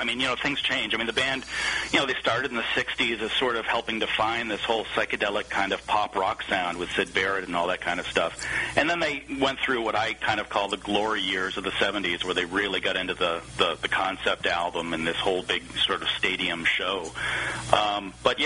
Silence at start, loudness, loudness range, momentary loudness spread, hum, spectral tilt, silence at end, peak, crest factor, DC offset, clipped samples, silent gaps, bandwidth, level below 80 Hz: 0 s; -26 LUFS; 1 LU; 4 LU; none; -3 dB/octave; 0 s; -2 dBFS; 24 dB; under 0.1%; under 0.1%; none; 10.5 kHz; -52 dBFS